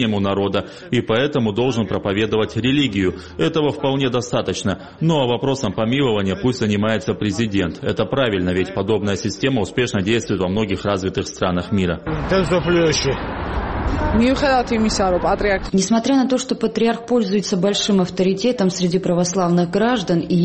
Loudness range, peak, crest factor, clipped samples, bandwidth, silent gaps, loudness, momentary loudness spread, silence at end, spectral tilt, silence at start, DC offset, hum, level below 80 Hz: 2 LU; -4 dBFS; 14 dB; under 0.1%; 8.8 kHz; none; -19 LUFS; 5 LU; 0 s; -5.5 dB/octave; 0 s; 0.2%; none; -36 dBFS